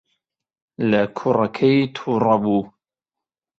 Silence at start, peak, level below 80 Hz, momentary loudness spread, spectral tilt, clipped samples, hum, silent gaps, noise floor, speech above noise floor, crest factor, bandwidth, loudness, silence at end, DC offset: 0.8 s; -2 dBFS; -60 dBFS; 6 LU; -8 dB/octave; under 0.1%; none; none; -88 dBFS; 69 dB; 18 dB; 7.4 kHz; -19 LUFS; 0.9 s; under 0.1%